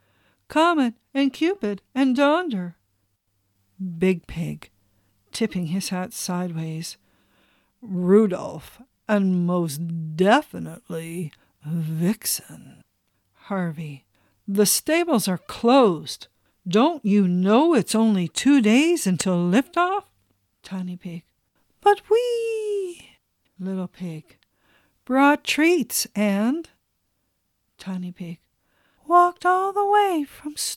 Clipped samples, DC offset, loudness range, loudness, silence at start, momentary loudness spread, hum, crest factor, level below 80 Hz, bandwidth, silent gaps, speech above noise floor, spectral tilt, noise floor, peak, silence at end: under 0.1%; under 0.1%; 9 LU; -22 LUFS; 0.5 s; 17 LU; none; 18 dB; -60 dBFS; 17 kHz; none; 51 dB; -5 dB/octave; -73 dBFS; -4 dBFS; 0 s